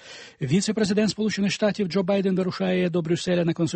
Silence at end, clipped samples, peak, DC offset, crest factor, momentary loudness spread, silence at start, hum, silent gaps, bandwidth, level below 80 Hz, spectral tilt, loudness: 0 s; under 0.1%; -10 dBFS; under 0.1%; 14 dB; 3 LU; 0.05 s; none; none; 8.8 kHz; -60 dBFS; -5.5 dB/octave; -24 LUFS